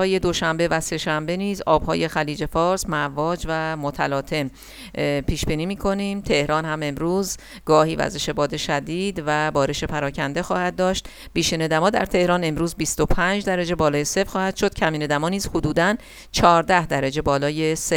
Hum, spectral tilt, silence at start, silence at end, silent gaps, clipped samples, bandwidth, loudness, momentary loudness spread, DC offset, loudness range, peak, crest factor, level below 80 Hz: none; -4.5 dB/octave; 0 s; 0 s; none; under 0.1%; 19.5 kHz; -22 LUFS; 6 LU; under 0.1%; 3 LU; 0 dBFS; 22 dB; -38 dBFS